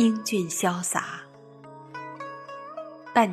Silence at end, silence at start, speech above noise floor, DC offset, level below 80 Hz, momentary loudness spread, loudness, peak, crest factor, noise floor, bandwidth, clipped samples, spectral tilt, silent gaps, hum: 0 s; 0 s; 22 dB; under 0.1%; -74 dBFS; 22 LU; -28 LUFS; -4 dBFS; 24 dB; -47 dBFS; 14 kHz; under 0.1%; -4 dB/octave; none; none